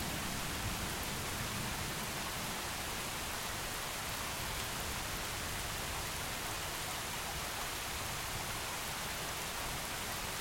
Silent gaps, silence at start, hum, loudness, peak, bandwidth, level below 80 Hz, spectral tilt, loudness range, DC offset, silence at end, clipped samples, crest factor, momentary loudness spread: none; 0 s; none; -38 LUFS; -24 dBFS; 16.5 kHz; -52 dBFS; -2 dB/octave; 0 LU; under 0.1%; 0 s; under 0.1%; 16 dB; 1 LU